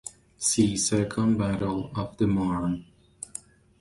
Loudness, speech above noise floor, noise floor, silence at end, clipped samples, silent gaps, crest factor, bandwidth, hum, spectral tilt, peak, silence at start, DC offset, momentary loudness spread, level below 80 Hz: -26 LUFS; 20 dB; -46 dBFS; 0.4 s; under 0.1%; none; 18 dB; 11.5 kHz; none; -5 dB/octave; -10 dBFS; 0.05 s; under 0.1%; 16 LU; -50 dBFS